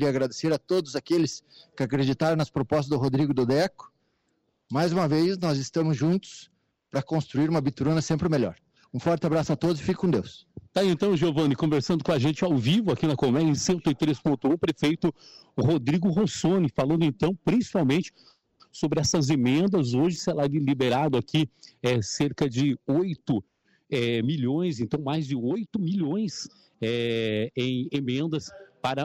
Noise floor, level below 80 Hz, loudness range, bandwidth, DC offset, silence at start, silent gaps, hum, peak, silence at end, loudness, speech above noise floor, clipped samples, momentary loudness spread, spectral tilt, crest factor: -73 dBFS; -56 dBFS; 4 LU; 13.5 kHz; under 0.1%; 0 s; none; none; -16 dBFS; 0 s; -26 LUFS; 48 dB; under 0.1%; 7 LU; -6 dB/octave; 10 dB